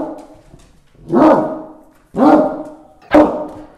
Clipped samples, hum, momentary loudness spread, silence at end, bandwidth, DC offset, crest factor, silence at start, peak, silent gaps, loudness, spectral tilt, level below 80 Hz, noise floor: under 0.1%; none; 18 LU; 0.15 s; 9 kHz; under 0.1%; 16 dB; 0 s; 0 dBFS; none; -13 LUFS; -7.5 dB/octave; -44 dBFS; -45 dBFS